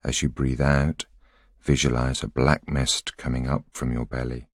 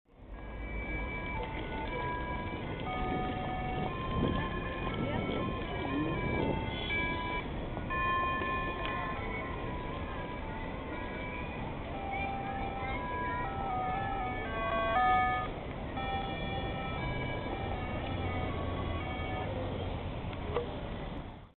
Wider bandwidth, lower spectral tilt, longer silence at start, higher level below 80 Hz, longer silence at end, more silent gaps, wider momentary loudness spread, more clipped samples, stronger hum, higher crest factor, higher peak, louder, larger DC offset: first, 14 kHz vs 4.5 kHz; about the same, -4.5 dB/octave vs -4.5 dB/octave; about the same, 0.05 s vs 0.1 s; first, -34 dBFS vs -44 dBFS; about the same, 0.1 s vs 0.05 s; neither; about the same, 8 LU vs 7 LU; neither; neither; about the same, 22 dB vs 18 dB; first, -4 dBFS vs -18 dBFS; first, -25 LUFS vs -35 LUFS; neither